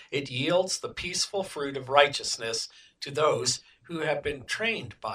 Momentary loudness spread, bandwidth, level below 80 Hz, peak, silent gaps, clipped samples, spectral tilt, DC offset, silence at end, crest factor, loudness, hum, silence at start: 10 LU; 16 kHz; -60 dBFS; -4 dBFS; none; under 0.1%; -2.5 dB/octave; under 0.1%; 0 s; 26 dB; -28 LUFS; none; 0 s